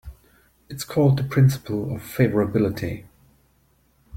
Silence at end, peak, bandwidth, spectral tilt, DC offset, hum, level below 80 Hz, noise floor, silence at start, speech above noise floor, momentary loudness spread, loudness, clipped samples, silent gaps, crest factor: 0 s; -4 dBFS; 16 kHz; -7.5 dB/octave; under 0.1%; none; -50 dBFS; -62 dBFS; 0.05 s; 41 dB; 14 LU; -22 LUFS; under 0.1%; none; 18 dB